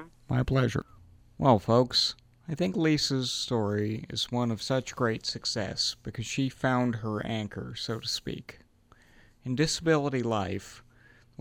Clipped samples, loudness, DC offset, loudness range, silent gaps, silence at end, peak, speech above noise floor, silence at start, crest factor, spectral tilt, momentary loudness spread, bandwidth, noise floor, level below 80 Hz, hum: under 0.1%; -29 LUFS; under 0.1%; 5 LU; none; 0.6 s; -8 dBFS; 31 dB; 0 s; 22 dB; -5 dB/octave; 12 LU; 16 kHz; -60 dBFS; -54 dBFS; none